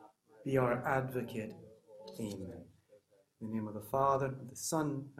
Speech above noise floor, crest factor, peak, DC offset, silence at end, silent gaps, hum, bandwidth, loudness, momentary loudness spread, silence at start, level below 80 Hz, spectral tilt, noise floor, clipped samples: 31 dB; 20 dB; -18 dBFS; under 0.1%; 0.05 s; none; none; 16 kHz; -36 LUFS; 19 LU; 0 s; -68 dBFS; -5.5 dB/octave; -67 dBFS; under 0.1%